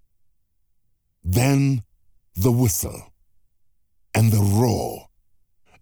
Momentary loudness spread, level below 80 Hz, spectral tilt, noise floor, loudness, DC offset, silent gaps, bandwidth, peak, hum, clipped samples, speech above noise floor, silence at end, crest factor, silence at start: 16 LU; -46 dBFS; -6 dB/octave; -70 dBFS; -21 LUFS; under 0.1%; none; over 20 kHz; -6 dBFS; none; under 0.1%; 51 dB; 0.8 s; 16 dB; 1.25 s